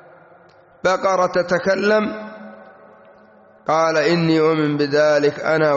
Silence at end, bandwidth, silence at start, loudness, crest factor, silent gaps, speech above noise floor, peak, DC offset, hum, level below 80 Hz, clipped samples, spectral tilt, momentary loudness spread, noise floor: 0 s; 8 kHz; 0.85 s; -18 LUFS; 14 dB; none; 32 dB; -6 dBFS; under 0.1%; none; -60 dBFS; under 0.1%; -4.5 dB/octave; 11 LU; -49 dBFS